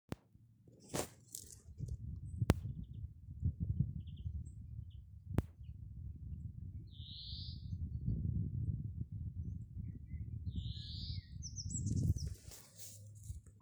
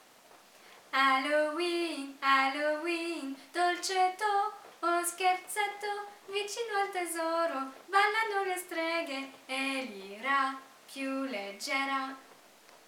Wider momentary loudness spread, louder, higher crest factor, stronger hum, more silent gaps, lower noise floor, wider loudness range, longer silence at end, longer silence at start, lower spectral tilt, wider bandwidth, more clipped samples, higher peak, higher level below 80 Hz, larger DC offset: first, 14 LU vs 11 LU; second, -44 LUFS vs -31 LUFS; first, 32 dB vs 20 dB; neither; neither; first, -66 dBFS vs -58 dBFS; about the same, 5 LU vs 4 LU; about the same, 0 s vs 0.1 s; second, 0.1 s vs 0.35 s; first, -5.5 dB/octave vs -1 dB/octave; about the same, over 20 kHz vs 19.5 kHz; neither; about the same, -12 dBFS vs -14 dBFS; first, -50 dBFS vs under -90 dBFS; neither